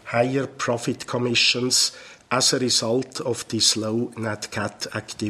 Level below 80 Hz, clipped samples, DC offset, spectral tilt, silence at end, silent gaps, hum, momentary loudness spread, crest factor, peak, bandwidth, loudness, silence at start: -60 dBFS; under 0.1%; under 0.1%; -2.5 dB/octave; 0 s; none; none; 10 LU; 20 dB; -4 dBFS; 15.5 kHz; -22 LUFS; 0.05 s